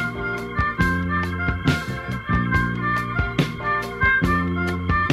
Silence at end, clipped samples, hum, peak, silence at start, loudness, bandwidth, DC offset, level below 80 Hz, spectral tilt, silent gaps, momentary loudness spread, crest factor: 0 s; under 0.1%; none; -6 dBFS; 0 s; -22 LUFS; 14.5 kHz; under 0.1%; -34 dBFS; -6.5 dB/octave; none; 6 LU; 16 dB